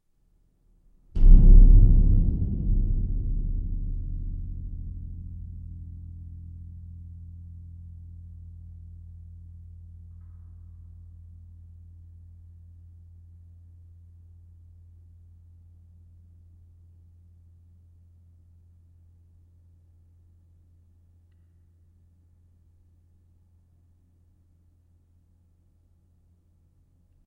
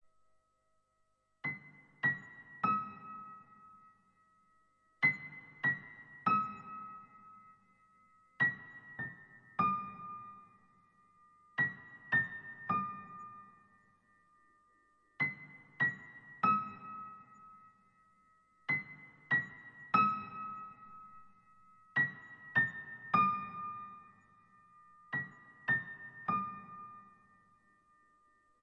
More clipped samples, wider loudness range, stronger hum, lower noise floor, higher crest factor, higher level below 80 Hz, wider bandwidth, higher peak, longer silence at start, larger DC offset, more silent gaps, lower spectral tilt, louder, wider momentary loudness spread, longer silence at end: neither; first, 29 LU vs 5 LU; neither; second, -65 dBFS vs -78 dBFS; about the same, 24 dB vs 24 dB; first, -26 dBFS vs -80 dBFS; second, 0.8 kHz vs 7.2 kHz; first, -2 dBFS vs -16 dBFS; second, 1.15 s vs 1.45 s; neither; neither; first, -12.5 dB/octave vs -7 dB/octave; first, -25 LUFS vs -36 LUFS; first, 31 LU vs 22 LU; first, 20.65 s vs 1.55 s